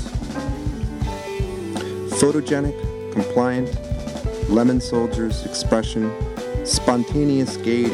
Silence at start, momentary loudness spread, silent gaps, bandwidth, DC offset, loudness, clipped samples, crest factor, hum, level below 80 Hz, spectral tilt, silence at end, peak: 0 s; 9 LU; none; 14.5 kHz; under 0.1%; -22 LUFS; under 0.1%; 20 dB; none; -32 dBFS; -5.5 dB/octave; 0 s; -2 dBFS